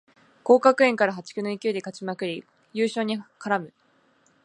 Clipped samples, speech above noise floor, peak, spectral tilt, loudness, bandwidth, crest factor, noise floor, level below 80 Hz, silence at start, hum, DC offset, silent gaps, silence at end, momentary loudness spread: under 0.1%; 39 dB; -4 dBFS; -5 dB/octave; -24 LUFS; 10.5 kHz; 22 dB; -63 dBFS; -80 dBFS; 0.45 s; none; under 0.1%; none; 0.75 s; 16 LU